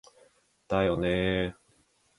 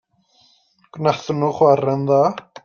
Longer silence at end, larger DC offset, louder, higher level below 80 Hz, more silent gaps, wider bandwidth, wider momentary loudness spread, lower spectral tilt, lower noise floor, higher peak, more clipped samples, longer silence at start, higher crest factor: first, 0.65 s vs 0.25 s; neither; second, -29 LUFS vs -18 LUFS; first, -48 dBFS vs -62 dBFS; neither; first, 11.5 kHz vs 7 kHz; about the same, 5 LU vs 6 LU; about the same, -7 dB/octave vs -7.5 dB/octave; first, -67 dBFS vs -58 dBFS; second, -12 dBFS vs -2 dBFS; neither; second, 0.7 s vs 0.95 s; about the same, 18 dB vs 18 dB